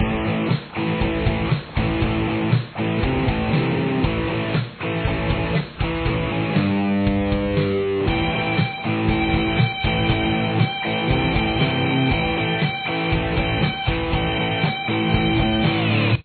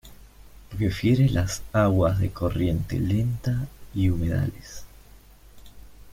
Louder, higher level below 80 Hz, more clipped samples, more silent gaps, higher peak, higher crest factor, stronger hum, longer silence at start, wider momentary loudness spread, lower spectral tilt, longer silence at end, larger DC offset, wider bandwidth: first, -21 LUFS vs -25 LUFS; first, -32 dBFS vs -40 dBFS; neither; neither; about the same, -6 dBFS vs -8 dBFS; about the same, 14 dB vs 18 dB; neither; about the same, 0 s vs 0.05 s; second, 4 LU vs 12 LU; first, -10 dB/octave vs -7 dB/octave; about the same, 0 s vs 0 s; neither; second, 4.5 kHz vs 16 kHz